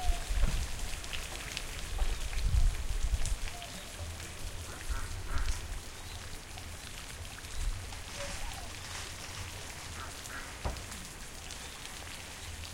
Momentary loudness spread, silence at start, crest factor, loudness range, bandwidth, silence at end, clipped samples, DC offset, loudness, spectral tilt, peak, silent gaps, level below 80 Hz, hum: 8 LU; 0 s; 20 dB; 5 LU; 16.5 kHz; 0 s; under 0.1%; under 0.1%; -40 LUFS; -3 dB/octave; -14 dBFS; none; -38 dBFS; none